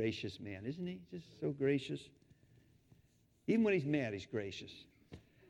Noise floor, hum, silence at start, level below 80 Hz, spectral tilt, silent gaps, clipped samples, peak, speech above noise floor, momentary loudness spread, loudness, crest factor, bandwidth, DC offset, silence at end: -71 dBFS; none; 0 s; -72 dBFS; -7 dB/octave; none; under 0.1%; -20 dBFS; 33 dB; 24 LU; -39 LUFS; 20 dB; 11 kHz; under 0.1%; 0.3 s